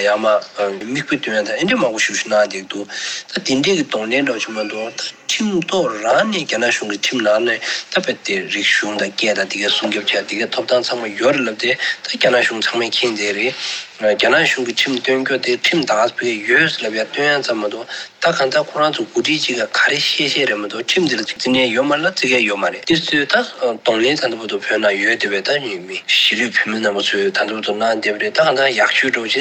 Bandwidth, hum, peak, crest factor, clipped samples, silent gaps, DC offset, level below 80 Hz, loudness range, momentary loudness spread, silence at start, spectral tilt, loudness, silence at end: 17 kHz; none; -2 dBFS; 16 dB; under 0.1%; none; under 0.1%; -64 dBFS; 2 LU; 7 LU; 0 s; -2.5 dB/octave; -16 LUFS; 0 s